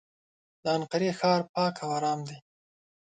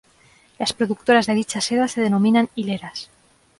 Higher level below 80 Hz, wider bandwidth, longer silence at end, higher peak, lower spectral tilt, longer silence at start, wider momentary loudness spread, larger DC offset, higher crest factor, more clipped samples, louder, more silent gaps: second, -74 dBFS vs -60 dBFS; second, 9.4 kHz vs 11.5 kHz; about the same, 0.65 s vs 0.55 s; second, -12 dBFS vs -6 dBFS; about the same, -5.5 dB/octave vs -4.5 dB/octave; about the same, 0.65 s vs 0.6 s; about the same, 10 LU vs 11 LU; neither; about the same, 18 dB vs 16 dB; neither; second, -29 LUFS vs -20 LUFS; first, 1.49-1.54 s vs none